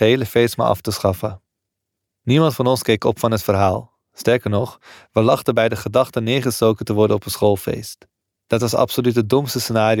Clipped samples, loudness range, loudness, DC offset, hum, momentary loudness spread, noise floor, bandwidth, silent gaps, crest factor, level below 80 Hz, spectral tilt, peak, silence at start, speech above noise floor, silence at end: under 0.1%; 1 LU; -18 LUFS; under 0.1%; none; 7 LU; -80 dBFS; 18.5 kHz; none; 16 dB; -50 dBFS; -5.5 dB/octave; -2 dBFS; 0 s; 62 dB; 0 s